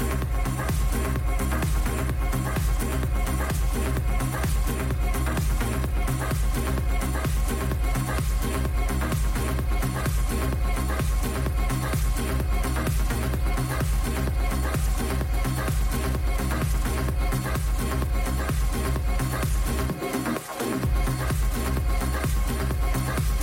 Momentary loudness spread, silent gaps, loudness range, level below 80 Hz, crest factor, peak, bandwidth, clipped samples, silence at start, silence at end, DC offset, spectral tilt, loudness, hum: 1 LU; none; 0 LU; -26 dBFS; 12 dB; -12 dBFS; 16.5 kHz; under 0.1%; 0 s; 0 s; under 0.1%; -5.5 dB/octave; -27 LUFS; none